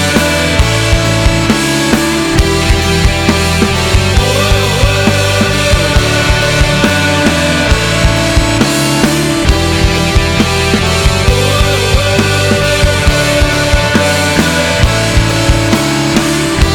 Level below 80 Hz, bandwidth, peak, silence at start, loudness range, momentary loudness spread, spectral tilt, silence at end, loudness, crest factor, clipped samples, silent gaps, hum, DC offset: -18 dBFS; over 20 kHz; 0 dBFS; 0 s; 1 LU; 1 LU; -4.5 dB/octave; 0 s; -10 LUFS; 10 dB; under 0.1%; none; none; 0.1%